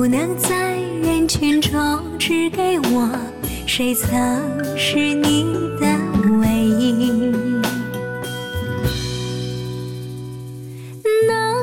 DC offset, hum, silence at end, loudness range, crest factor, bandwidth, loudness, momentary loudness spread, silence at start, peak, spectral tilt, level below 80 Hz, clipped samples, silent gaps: under 0.1%; none; 0 s; 6 LU; 14 dB; 17.5 kHz; -19 LUFS; 10 LU; 0 s; -6 dBFS; -4.5 dB/octave; -38 dBFS; under 0.1%; none